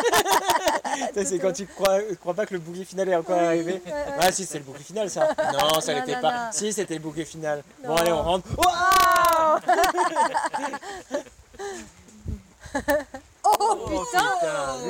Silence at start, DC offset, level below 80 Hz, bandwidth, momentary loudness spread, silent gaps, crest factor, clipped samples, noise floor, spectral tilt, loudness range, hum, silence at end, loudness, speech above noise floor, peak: 0 s; under 0.1%; -50 dBFS; 17 kHz; 14 LU; none; 18 dB; under 0.1%; -44 dBFS; -3 dB/octave; 7 LU; none; 0 s; -23 LUFS; 20 dB; -6 dBFS